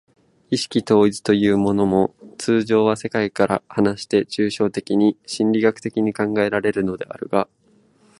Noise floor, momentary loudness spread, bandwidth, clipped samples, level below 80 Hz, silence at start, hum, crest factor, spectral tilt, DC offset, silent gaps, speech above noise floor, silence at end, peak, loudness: -56 dBFS; 7 LU; 11.5 kHz; under 0.1%; -54 dBFS; 0.5 s; none; 18 dB; -6 dB/octave; under 0.1%; none; 37 dB; 0.75 s; -2 dBFS; -20 LUFS